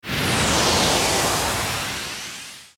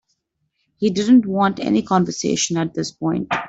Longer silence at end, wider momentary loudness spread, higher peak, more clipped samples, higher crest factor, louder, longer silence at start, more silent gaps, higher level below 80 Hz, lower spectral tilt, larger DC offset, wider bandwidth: about the same, 0.1 s vs 0 s; first, 13 LU vs 9 LU; about the same, -6 dBFS vs -4 dBFS; neither; about the same, 16 dB vs 16 dB; about the same, -20 LUFS vs -19 LUFS; second, 0.05 s vs 0.8 s; neither; first, -40 dBFS vs -56 dBFS; second, -2.5 dB/octave vs -5 dB/octave; neither; first, 20 kHz vs 8 kHz